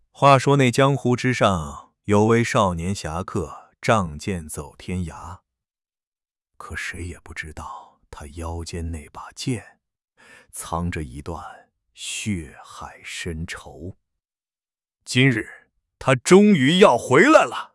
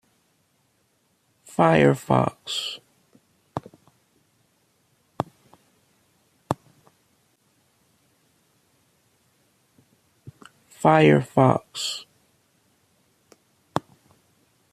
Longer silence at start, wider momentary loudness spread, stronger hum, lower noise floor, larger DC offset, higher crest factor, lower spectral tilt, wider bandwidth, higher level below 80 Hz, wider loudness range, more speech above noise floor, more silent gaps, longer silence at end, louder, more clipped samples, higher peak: second, 0.2 s vs 1.6 s; first, 23 LU vs 19 LU; neither; first, under -90 dBFS vs -68 dBFS; neither; about the same, 22 dB vs 26 dB; about the same, -5.5 dB/octave vs -6 dB/octave; second, 12 kHz vs 14.5 kHz; first, -48 dBFS vs -62 dBFS; second, 15 LU vs 18 LU; first, over 69 dB vs 48 dB; first, 6.07-6.12 s vs none; second, 0.1 s vs 0.95 s; first, -20 LUFS vs -23 LUFS; neither; about the same, 0 dBFS vs -2 dBFS